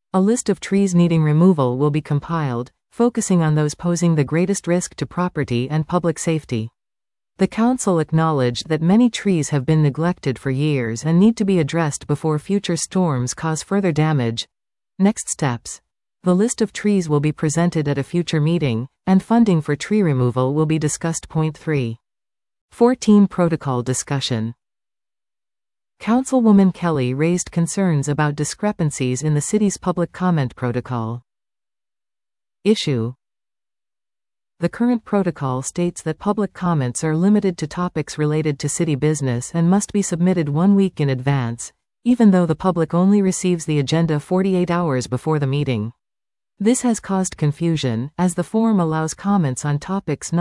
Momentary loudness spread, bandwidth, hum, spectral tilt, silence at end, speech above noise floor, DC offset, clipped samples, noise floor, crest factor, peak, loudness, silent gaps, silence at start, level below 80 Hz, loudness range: 8 LU; 12 kHz; none; -6 dB/octave; 0 s; over 72 dB; under 0.1%; under 0.1%; under -90 dBFS; 16 dB; -4 dBFS; -19 LUFS; 22.61-22.68 s; 0.15 s; -52 dBFS; 5 LU